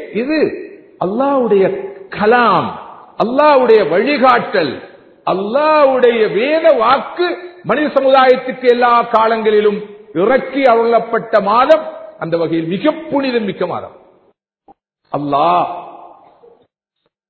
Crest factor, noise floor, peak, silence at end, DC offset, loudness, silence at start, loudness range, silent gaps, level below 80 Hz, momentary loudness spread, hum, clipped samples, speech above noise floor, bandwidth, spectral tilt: 14 dB; -69 dBFS; 0 dBFS; 1.2 s; under 0.1%; -13 LUFS; 0 s; 7 LU; none; -56 dBFS; 14 LU; none; under 0.1%; 57 dB; 6 kHz; -7.5 dB/octave